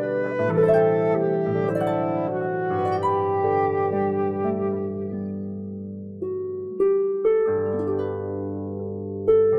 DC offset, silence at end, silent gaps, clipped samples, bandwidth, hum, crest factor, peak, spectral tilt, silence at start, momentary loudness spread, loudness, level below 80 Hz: under 0.1%; 0 s; none; under 0.1%; 5.8 kHz; none; 16 dB; -8 dBFS; -9.5 dB/octave; 0 s; 11 LU; -24 LUFS; -60 dBFS